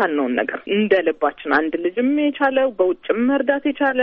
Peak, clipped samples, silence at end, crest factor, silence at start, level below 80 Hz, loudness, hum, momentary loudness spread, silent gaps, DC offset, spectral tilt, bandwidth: -2 dBFS; under 0.1%; 0 s; 16 dB; 0 s; -60 dBFS; -19 LUFS; none; 4 LU; none; under 0.1%; -3 dB/octave; 5.4 kHz